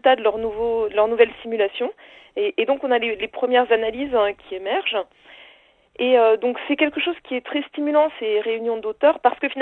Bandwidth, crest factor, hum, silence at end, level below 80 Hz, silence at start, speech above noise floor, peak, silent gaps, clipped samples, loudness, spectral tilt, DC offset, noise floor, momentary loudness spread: 4.2 kHz; 20 dB; none; 0 s; -58 dBFS; 0.05 s; 33 dB; -2 dBFS; none; under 0.1%; -21 LUFS; -6 dB/octave; under 0.1%; -53 dBFS; 8 LU